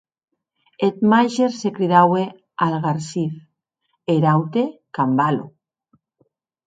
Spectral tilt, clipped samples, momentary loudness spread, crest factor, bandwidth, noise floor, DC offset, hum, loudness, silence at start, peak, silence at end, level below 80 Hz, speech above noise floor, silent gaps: -7 dB/octave; under 0.1%; 11 LU; 20 dB; 9.2 kHz; -73 dBFS; under 0.1%; none; -19 LUFS; 0.8 s; 0 dBFS; 1.2 s; -66 dBFS; 54 dB; none